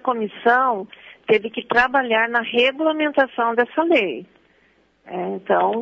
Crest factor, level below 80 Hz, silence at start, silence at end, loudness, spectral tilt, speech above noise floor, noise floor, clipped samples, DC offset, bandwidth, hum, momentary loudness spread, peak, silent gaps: 16 dB; -60 dBFS; 0.05 s; 0 s; -19 LUFS; -5.5 dB/octave; 40 dB; -59 dBFS; under 0.1%; under 0.1%; 7.6 kHz; none; 11 LU; -4 dBFS; none